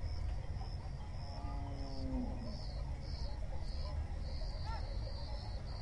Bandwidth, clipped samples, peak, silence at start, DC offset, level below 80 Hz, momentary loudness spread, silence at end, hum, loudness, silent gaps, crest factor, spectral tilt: 11 kHz; under 0.1%; -28 dBFS; 0 s; under 0.1%; -42 dBFS; 3 LU; 0 s; none; -44 LUFS; none; 12 dB; -7 dB/octave